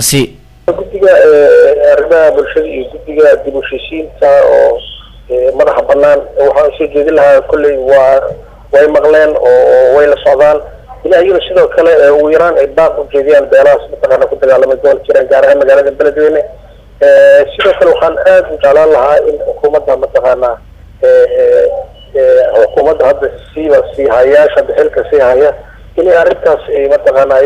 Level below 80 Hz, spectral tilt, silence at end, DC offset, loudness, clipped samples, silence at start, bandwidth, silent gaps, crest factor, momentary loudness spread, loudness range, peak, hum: -36 dBFS; -4 dB/octave; 0 s; under 0.1%; -7 LUFS; 0.7%; 0 s; 14 kHz; none; 8 dB; 10 LU; 2 LU; 0 dBFS; none